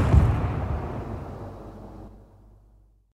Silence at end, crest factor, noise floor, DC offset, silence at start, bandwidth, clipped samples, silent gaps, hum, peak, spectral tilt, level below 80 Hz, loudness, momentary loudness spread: 0.95 s; 22 dB; -57 dBFS; under 0.1%; 0 s; 8.6 kHz; under 0.1%; none; none; -4 dBFS; -9 dB/octave; -30 dBFS; -27 LUFS; 23 LU